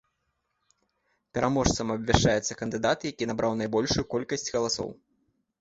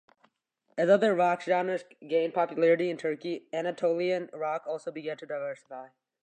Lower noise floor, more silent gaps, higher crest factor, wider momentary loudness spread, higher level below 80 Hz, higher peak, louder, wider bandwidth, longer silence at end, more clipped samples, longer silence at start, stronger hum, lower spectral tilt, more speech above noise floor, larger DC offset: first, -78 dBFS vs -73 dBFS; neither; first, 26 dB vs 20 dB; second, 8 LU vs 13 LU; first, -44 dBFS vs -86 dBFS; first, -2 dBFS vs -10 dBFS; about the same, -27 LUFS vs -29 LUFS; second, 8 kHz vs 9 kHz; first, 0.65 s vs 0.4 s; neither; first, 1.35 s vs 0.75 s; neither; second, -4.5 dB/octave vs -6 dB/octave; first, 51 dB vs 45 dB; neither